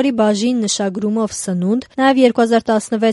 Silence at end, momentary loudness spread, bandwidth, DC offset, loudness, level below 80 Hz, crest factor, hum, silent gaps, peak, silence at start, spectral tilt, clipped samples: 0 s; 7 LU; 11.5 kHz; under 0.1%; -16 LUFS; -56 dBFS; 14 dB; none; none; 0 dBFS; 0 s; -4.5 dB/octave; under 0.1%